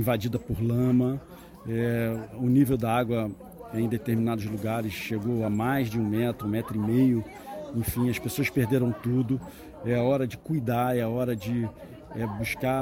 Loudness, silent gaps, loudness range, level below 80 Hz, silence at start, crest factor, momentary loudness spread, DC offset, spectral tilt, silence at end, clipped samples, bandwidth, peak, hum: -27 LUFS; none; 2 LU; -50 dBFS; 0 s; 16 dB; 11 LU; under 0.1%; -7 dB/octave; 0 s; under 0.1%; 17 kHz; -12 dBFS; none